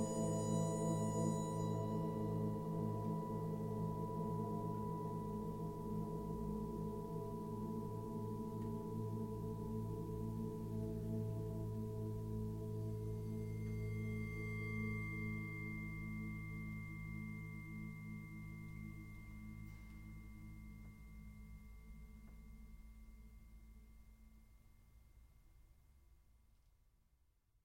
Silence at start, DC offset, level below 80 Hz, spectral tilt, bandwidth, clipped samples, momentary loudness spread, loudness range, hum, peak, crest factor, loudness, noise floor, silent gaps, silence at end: 0 s; under 0.1%; -58 dBFS; -7.5 dB/octave; 16.5 kHz; under 0.1%; 18 LU; 18 LU; none; -26 dBFS; 18 dB; -44 LUFS; -77 dBFS; none; 0.95 s